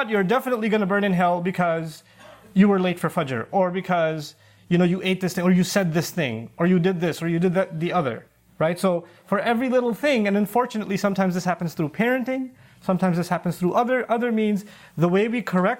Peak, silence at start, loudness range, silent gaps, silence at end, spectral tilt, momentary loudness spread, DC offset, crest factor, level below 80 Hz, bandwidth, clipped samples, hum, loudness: -6 dBFS; 0 s; 2 LU; none; 0 s; -6.5 dB/octave; 7 LU; under 0.1%; 16 dB; -64 dBFS; 16.5 kHz; under 0.1%; none; -23 LUFS